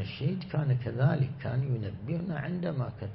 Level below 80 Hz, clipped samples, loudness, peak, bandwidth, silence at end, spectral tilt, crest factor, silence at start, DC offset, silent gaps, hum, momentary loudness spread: -56 dBFS; under 0.1%; -31 LUFS; -14 dBFS; 5.6 kHz; 0 s; -11.5 dB/octave; 16 dB; 0 s; under 0.1%; none; none; 7 LU